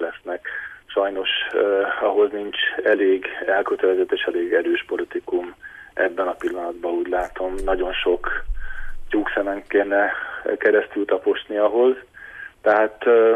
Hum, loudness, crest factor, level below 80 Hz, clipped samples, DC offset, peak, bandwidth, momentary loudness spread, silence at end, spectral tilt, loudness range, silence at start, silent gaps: none; -21 LUFS; 16 dB; -40 dBFS; under 0.1%; under 0.1%; -6 dBFS; 9.8 kHz; 12 LU; 0 s; -5 dB/octave; 4 LU; 0 s; none